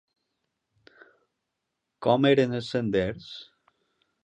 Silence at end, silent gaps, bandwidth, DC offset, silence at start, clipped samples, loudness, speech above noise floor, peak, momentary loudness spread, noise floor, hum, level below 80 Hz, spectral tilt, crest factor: 0.8 s; none; 9.6 kHz; under 0.1%; 2 s; under 0.1%; -25 LUFS; 58 dB; -8 dBFS; 20 LU; -82 dBFS; none; -58 dBFS; -7 dB/octave; 22 dB